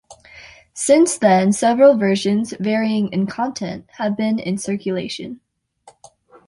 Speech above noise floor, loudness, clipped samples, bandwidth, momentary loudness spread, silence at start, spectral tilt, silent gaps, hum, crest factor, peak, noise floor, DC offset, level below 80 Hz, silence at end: 34 dB; -18 LUFS; under 0.1%; 11.5 kHz; 15 LU; 0.1 s; -5 dB/octave; none; none; 16 dB; -2 dBFS; -51 dBFS; under 0.1%; -60 dBFS; 1.15 s